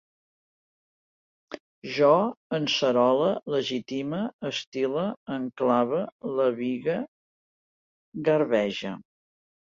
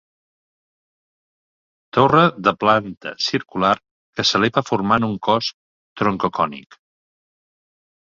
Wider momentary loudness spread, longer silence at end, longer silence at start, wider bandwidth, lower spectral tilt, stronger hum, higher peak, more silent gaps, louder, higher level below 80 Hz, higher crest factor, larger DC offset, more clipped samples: first, 15 LU vs 9 LU; second, 0.75 s vs 1.5 s; second, 1.5 s vs 1.95 s; about the same, 7.6 kHz vs 7.6 kHz; about the same, -5.5 dB/octave vs -5 dB/octave; neither; second, -6 dBFS vs -2 dBFS; first, 1.60-1.82 s, 2.37-2.50 s, 4.33-4.39 s, 4.67-4.72 s, 5.17-5.26 s, 6.12-6.19 s, 7.08-8.12 s vs 3.91-4.13 s, 5.54-5.96 s; second, -26 LUFS vs -19 LUFS; second, -72 dBFS vs -56 dBFS; about the same, 20 dB vs 20 dB; neither; neither